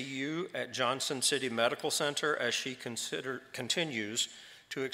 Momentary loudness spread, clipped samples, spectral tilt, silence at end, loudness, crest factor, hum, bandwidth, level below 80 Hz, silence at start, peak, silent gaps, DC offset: 9 LU; under 0.1%; -2 dB/octave; 0 s; -33 LUFS; 22 dB; none; 16 kHz; -82 dBFS; 0 s; -12 dBFS; none; under 0.1%